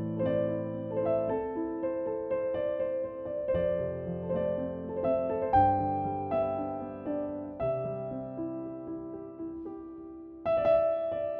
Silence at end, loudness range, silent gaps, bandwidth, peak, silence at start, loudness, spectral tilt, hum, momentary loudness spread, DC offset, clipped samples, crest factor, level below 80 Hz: 0 s; 7 LU; none; 5 kHz; -12 dBFS; 0 s; -31 LUFS; -7.5 dB/octave; none; 14 LU; under 0.1%; under 0.1%; 18 dB; -56 dBFS